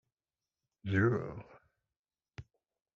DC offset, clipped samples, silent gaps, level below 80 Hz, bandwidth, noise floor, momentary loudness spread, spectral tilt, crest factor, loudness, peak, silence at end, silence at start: under 0.1%; under 0.1%; 1.99-2.05 s; -68 dBFS; 7 kHz; under -90 dBFS; 24 LU; -7 dB/octave; 20 dB; -33 LUFS; -18 dBFS; 0.55 s; 0.85 s